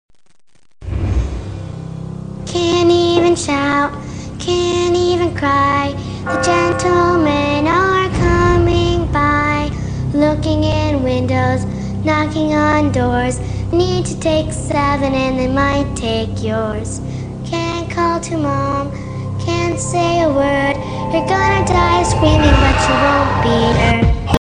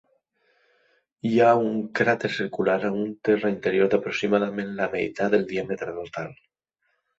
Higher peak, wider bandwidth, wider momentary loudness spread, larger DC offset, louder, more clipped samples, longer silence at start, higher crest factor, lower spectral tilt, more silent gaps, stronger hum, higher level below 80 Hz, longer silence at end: first, 0 dBFS vs -6 dBFS; first, 10 kHz vs 8 kHz; about the same, 10 LU vs 12 LU; first, 0.4% vs under 0.1%; first, -15 LUFS vs -24 LUFS; neither; second, 0.8 s vs 1.25 s; about the same, 16 dB vs 20 dB; about the same, -5.5 dB/octave vs -6.5 dB/octave; neither; neither; first, -26 dBFS vs -64 dBFS; second, 0.05 s vs 0.85 s